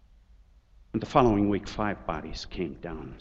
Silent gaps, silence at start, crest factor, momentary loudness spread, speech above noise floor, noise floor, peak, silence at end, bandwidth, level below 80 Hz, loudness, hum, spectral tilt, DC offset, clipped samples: none; 0.95 s; 24 dB; 15 LU; 29 dB; -57 dBFS; -6 dBFS; 0 s; 7.8 kHz; -44 dBFS; -28 LUFS; none; -7 dB/octave; under 0.1%; under 0.1%